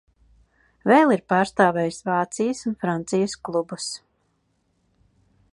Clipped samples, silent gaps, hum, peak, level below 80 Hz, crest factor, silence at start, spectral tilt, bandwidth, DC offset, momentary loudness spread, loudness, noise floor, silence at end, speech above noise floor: under 0.1%; none; none; -2 dBFS; -62 dBFS; 22 dB; 0.85 s; -5 dB/octave; 11.5 kHz; under 0.1%; 13 LU; -22 LUFS; -69 dBFS; 1.55 s; 48 dB